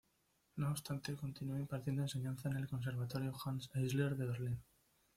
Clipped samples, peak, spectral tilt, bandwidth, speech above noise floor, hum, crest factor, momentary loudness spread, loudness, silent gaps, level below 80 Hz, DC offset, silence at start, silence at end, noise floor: under 0.1%; -24 dBFS; -6.5 dB/octave; 16 kHz; 38 dB; none; 18 dB; 6 LU; -42 LUFS; none; -68 dBFS; under 0.1%; 0.55 s; 0.55 s; -79 dBFS